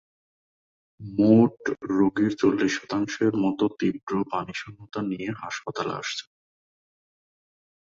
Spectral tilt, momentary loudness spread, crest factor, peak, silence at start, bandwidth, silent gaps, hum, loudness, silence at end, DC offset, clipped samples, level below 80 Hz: -6 dB/octave; 14 LU; 20 dB; -6 dBFS; 1 s; 7.6 kHz; 4.03-4.07 s; none; -25 LUFS; 1.7 s; under 0.1%; under 0.1%; -62 dBFS